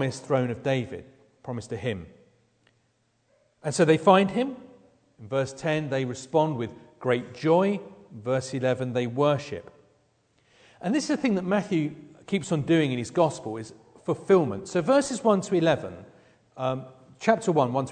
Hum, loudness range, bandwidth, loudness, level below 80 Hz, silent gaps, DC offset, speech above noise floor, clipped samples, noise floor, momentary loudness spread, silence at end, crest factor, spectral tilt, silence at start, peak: none; 5 LU; 9.4 kHz; -26 LUFS; -64 dBFS; none; under 0.1%; 45 dB; under 0.1%; -70 dBFS; 15 LU; 0 s; 22 dB; -6 dB/octave; 0 s; -4 dBFS